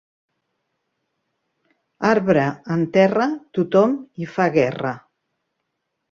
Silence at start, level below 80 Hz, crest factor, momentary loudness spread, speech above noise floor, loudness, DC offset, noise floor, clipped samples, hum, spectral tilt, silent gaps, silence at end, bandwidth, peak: 2 s; -62 dBFS; 20 dB; 11 LU; 58 dB; -20 LUFS; under 0.1%; -77 dBFS; under 0.1%; none; -7.5 dB/octave; none; 1.15 s; 7.4 kHz; -2 dBFS